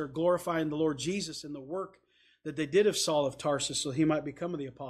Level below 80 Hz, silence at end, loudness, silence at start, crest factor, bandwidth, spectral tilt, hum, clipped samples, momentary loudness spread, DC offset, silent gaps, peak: -66 dBFS; 0 s; -31 LUFS; 0 s; 16 dB; 15 kHz; -4.5 dB/octave; 60 Hz at -65 dBFS; under 0.1%; 12 LU; under 0.1%; none; -16 dBFS